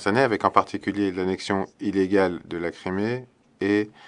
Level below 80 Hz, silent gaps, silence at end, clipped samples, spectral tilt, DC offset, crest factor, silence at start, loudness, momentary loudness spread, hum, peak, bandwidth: -66 dBFS; none; 0 s; under 0.1%; -6 dB/octave; under 0.1%; 24 dB; 0 s; -25 LUFS; 9 LU; none; -2 dBFS; 10.5 kHz